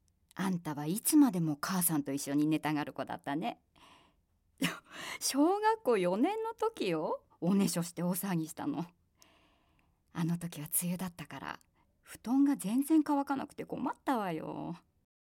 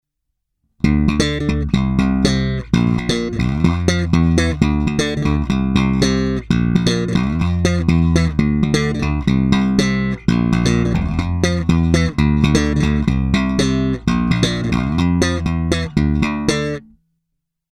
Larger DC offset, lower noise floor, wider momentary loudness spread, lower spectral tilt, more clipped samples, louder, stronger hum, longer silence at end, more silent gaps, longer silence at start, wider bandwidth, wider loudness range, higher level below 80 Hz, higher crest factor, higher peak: neither; about the same, -73 dBFS vs -75 dBFS; first, 14 LU vs 4 LU; about the same, -5 dB/octave vs -6 dB/octave; neither; second, -33 LUFS vs -17 LUFS; neither; second, 0.45 s vs 0.9 s; neither; second, 0.4 s vs 0.85 s; first, 17 kHz vs 12 kHz; first, 6 LU vs 1 LU; second, -72 dBFS vs -26 dBFS; about the same, 18 dB vs 16 dB; second, -16 dBFS vs 0 dBFS